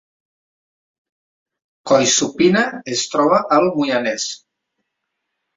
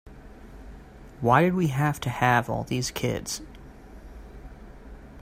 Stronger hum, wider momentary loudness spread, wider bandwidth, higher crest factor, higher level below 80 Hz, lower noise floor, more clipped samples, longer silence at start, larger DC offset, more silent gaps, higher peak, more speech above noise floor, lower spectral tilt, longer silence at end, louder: neither; second, 10 LU vs 26 LU; second, 7.8 kHz vs 16 kHz; second, 18 dB vs 24 dB; second, -60 dBFS vs -46 dBFS; first, -77 dBFS vs -45 dBFS; neither; first, 1.85 s vs 0.05 s; neither; neither; about the same, -2 dBFS vs -4 dBFS; first, 60 dB vs 21 dB; second, -3 dB/octave vs -5.5 dB/octave; first, 1.2 s vs 0 s; first, -16 LUFS vs -25 LUFS